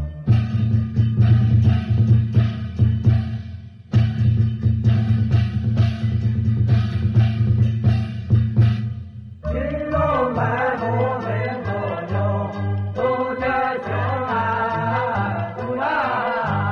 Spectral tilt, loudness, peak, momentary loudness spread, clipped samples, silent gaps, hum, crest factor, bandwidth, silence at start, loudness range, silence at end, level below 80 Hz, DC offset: -9.5 dB/octave; -20 LUFS; -6 dBFS; 8 LU; under 0.1%; none; none; 14 dB; 5.6 kHz; 0 s; 4 LU; 0 s; -36 dBFS; under 0.1%